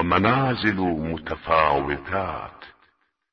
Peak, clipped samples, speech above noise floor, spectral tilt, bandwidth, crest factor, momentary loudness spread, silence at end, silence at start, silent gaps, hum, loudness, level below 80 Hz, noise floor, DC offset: -2 dBFS; under 0.1%; 42 dB; -8 dB/octave; 6.4 kHz; 22 dB; 11 LU; 0.65 s; 0 s; none; none; -23 LUFS; -46 dBFS; -65 dBFS; under 0.1%